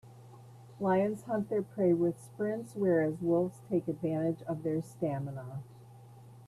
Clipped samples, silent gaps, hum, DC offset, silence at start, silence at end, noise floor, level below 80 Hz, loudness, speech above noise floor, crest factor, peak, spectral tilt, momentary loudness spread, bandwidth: under 0.1%; none; none; under 0.1%; 0.05 s; 0 s; -53 dBFS; -70 dBFS; -33 LUFS; 21 dB; 16 dB; -18 dBFS; -9 dB/octave; 9 LU; 13 kHz